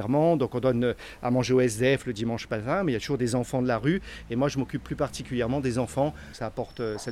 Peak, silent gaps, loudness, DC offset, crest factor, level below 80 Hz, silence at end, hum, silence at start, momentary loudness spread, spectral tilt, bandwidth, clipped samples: -12 dBFS; none; -27 LUFS; under 0.1%; 16 dB; -48 dBFS; 0 s; none; 0 s; 9 LU; -6 dB/octave; 14 kHz; under 0.1%